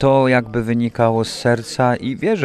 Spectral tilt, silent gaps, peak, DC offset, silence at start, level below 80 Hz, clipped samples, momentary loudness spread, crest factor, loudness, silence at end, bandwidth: -6.5 dB/octave; none; -2 dBFS; under 0.1%; 0 s; -46 dBFS; under 0.1%; 5 LU; 14 dB; -18 LUFS; 0 s; 13 kHz